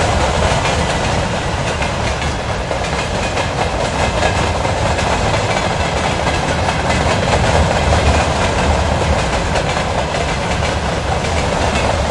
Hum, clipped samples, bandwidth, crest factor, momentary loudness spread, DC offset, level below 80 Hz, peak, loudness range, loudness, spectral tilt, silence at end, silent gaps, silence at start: none; under 0.1%; 11.5 kHz; 14 dB; 4 LU; under 0.1%; -24 dBFS; 0 dBFS; 3 LU; -16 LUFS; -4.5 dB/octave; 0 s; none; 0 s